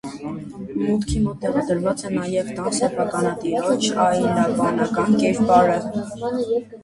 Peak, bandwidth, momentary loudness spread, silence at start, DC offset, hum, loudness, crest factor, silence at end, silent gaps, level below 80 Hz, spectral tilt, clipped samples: -2 dBFS; 11.5 kHz; 10 LU; 0.05 s; under 0.1%; none; -21 LUFS; 20 dB; 0.05 s; none; -42 dBFS; -5.5 dB/octave; under 0.1%